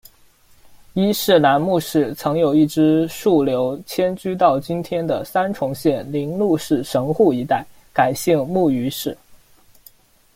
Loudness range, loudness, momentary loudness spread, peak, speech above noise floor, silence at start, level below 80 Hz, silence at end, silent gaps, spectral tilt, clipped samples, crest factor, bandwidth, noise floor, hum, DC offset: 3 LU; -19 LUFS; 8 LU; -2 dBFS; 34 dB; 0.7 s; -54 dBFS; 1 s; none; -6 dB/octave; under 0.1%; 16 dB; 16.5 kHz; -52 dBFS; none; under 0.1%